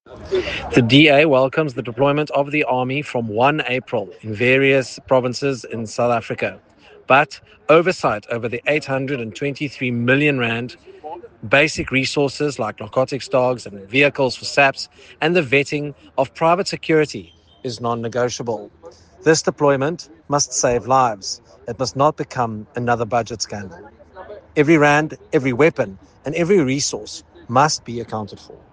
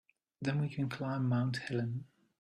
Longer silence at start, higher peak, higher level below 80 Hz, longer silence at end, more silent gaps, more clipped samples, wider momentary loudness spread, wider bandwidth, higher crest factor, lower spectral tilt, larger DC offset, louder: second, 0.1 s vs 0.4 s; first, 0 dBFS vs -20 dBFS; first, -52 dBFS vs -72 dBFS; second, 0.15 s vs 0.35 s; neither; neither; first, 13 LU vs 7 LU; about the same, 10 kHz vs 10.5 kHz; about the same, 20 dB vs 16 dB; second, -4.5 dB/octave vs -7.5 dB/octave; neither; first, -18 LUFS vs -36 LUFS